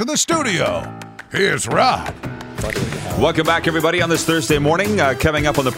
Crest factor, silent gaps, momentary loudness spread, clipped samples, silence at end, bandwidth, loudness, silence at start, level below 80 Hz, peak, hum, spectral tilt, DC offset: 18 dB; none; 11 LU; under 0.1%; 0 s; 16 kHz; -17 LUFS; 0 s; -38 dBFS; 0 dBFS; none; -4 dB/octave; under 0.1%